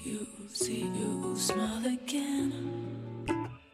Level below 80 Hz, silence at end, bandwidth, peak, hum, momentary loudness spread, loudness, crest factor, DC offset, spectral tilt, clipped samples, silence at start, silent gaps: -60 dBFS; 0.1 s; 15.5 kHz; -18 dBFS; none; 9 LU; -34 LUFS; 16 dB; under 0.1%; -4 dB/octave; under 0.1%; 0 s; none